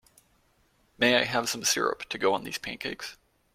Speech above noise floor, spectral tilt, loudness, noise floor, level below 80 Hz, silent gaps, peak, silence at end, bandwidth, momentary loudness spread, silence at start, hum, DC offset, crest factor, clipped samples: 39 dB; -2 dB/octave; -27 LUFS; -67 dBFS; -64 dBFS; none; -8 dBFS; 0.4 s; 16.5 kHz; 12 LU; 1 s; none; under 0.1%; 24 dB; under 0.1%